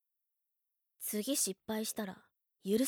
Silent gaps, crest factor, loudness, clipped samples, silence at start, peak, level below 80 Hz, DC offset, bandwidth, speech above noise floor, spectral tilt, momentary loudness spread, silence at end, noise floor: none; 18 dB; -37 LUFS; under 0.1%; 1 s; -20 dBFS; -80 dBFS; under 0.1%; over 20 kHz; 47 dB; -3 dB/octave; 13 LU; 0 s; -84 dBFS